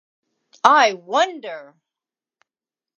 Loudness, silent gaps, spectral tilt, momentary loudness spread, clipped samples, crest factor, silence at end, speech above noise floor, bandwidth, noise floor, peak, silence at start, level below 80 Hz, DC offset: -17 LUFS; none; -1.5 dB/octave; 20 LU; under 0.1%; 22 dB; 1.35 s; over 72 dB; 8.6 kHz; under -90 dBFS; 0 dBFS; 0.65 s; -74 dBFS; under 0.1%